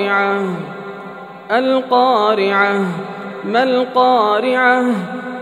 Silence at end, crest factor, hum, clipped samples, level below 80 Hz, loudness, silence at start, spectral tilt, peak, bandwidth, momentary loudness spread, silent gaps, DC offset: 0 s; 16 dB; none; under 0.1%; -74 dBFS; -15 LUFS; 0 s; -6 dB/octave; 0 dBFS; 10 kHz; 16 LU; none; under 0.1%